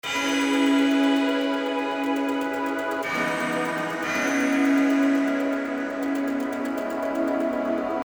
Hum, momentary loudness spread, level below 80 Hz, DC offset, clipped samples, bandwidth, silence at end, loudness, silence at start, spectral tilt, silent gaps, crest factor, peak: none; 7 LU; -64 dBFS; under 0.1%; under 0.1%; over 20 kHz; 0.05 s; -24 LUFS; 0.05 s; -3.5 dB/octave; none; 14 dB; -10 dBFS